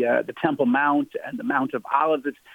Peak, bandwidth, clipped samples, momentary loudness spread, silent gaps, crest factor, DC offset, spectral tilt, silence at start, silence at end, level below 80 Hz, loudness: -6 dBFS; 17 kHz; under 0.1%; 6 LU; none; 16 dB; under 0.1%; -7.5 dB/octave; 0 s; 0.2 s; -72 dBFS; -23 LUFS